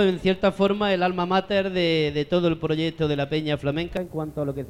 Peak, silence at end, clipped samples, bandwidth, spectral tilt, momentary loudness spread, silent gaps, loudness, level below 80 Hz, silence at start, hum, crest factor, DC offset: -6 dBFS; 0 s; under 0.1%; 12.5 kHz; -7 dB/octave; 7 LU; none; -24 LUFS; -48 dBFS; 0 s; none; 16 dB; under 0.1%